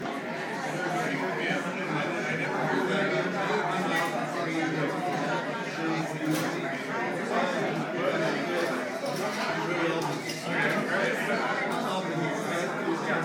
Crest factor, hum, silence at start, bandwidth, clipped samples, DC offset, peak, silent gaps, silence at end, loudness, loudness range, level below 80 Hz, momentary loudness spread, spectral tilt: 16 dB; none; 0 s; 19 kHz; under 0.1%; under 0.1%; -14 dBFS; none; 0 s; -29 LUFS; 1 LU; -78 dBFS; 4 LU; -5 dB/octave